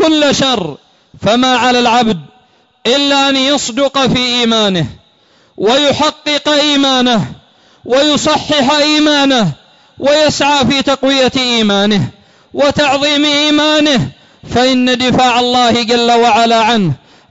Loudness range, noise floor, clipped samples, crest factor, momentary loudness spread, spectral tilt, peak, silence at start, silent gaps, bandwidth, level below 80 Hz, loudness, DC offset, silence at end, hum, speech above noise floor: 2 LU; -50 dBFS; under 0.1%; 8 dB; 8 LU; -4 dB/octave; -2 dBFS; 0 s; none; 8 kHz; -44 dBFS; -10 LUFS; under 0.1%; 0.35 s; none; 39 dB